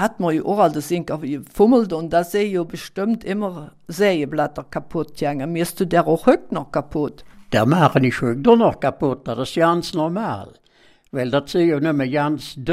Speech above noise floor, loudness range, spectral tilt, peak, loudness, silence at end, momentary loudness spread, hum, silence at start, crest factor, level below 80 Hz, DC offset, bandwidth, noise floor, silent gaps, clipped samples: 35 dB; 4 LU; -6.5 dB/octave; 0 dBFS; -20 LUFS; 0 s; 11 LU; none; 0 s; 18 dB; -48 dBFS; under 0.1%; 15.5 kHz; -54 dBFS; none; under 0.1%